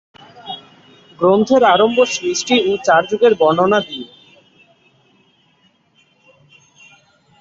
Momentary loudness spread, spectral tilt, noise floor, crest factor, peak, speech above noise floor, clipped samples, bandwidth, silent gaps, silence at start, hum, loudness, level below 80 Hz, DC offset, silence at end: 19 LU; -4 dB/octave; -57 dBFS; 18 dB; 0 dBFS; 44 dB; under 0.1%; 7.8 kHz; none; 0.45 s; none; -14 LUFS; -60 dBFS; under 0.1%; 3.35 s